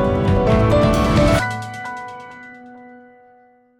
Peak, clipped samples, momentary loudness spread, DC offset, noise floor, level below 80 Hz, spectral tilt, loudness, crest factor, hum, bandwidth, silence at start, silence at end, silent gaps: -6 dBFS; under 0.1%; 21 LU; under 0.1%; -52 dBFS; -28 dBFS; -7 dB/octave; -17 LUFS; 14 dB; none; 17.5 kHz; 0 s; 0.85 s; none